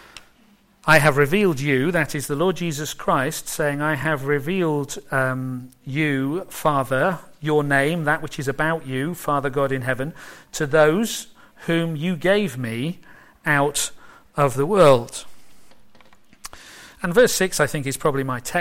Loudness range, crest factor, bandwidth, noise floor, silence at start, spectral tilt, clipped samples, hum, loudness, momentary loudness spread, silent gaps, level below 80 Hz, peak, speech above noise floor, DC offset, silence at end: 3 LU; 18 dB; 16.5 kHz; -56 dBFS; 0.15 s; -5 dB/octave; under 0.1%; none; -21 LUFS; 14 LU; none; -48 dBFS; -4 dBFS; 35 dB; under 0.1%; 0 s